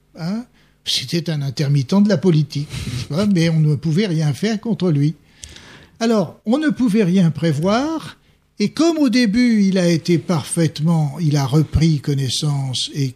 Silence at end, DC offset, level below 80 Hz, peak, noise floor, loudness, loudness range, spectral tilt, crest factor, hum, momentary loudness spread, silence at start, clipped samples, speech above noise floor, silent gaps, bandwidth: 0.05 s; under 0.1%; -42 dBFS; -4 dBFS; -42 dBFS; -18 LUFS; 3 LU; -6 dB/octave; 14 dB; none; 11 LU; 0.15 s; under 0.1%; 25 dB; none; 14 kHz